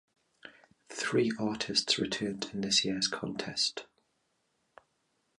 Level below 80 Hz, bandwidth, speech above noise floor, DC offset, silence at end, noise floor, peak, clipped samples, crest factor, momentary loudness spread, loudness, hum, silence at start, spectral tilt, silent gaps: -68 dBFS; 11.5 kHz; 45 dB; under 0.1%; 1.55 s; -77 dBFS; -14 dBFS; under 0.1%; 22 dB; 9 LU; -31 LUFS; none; 0.45 s; -3 dB/octave; none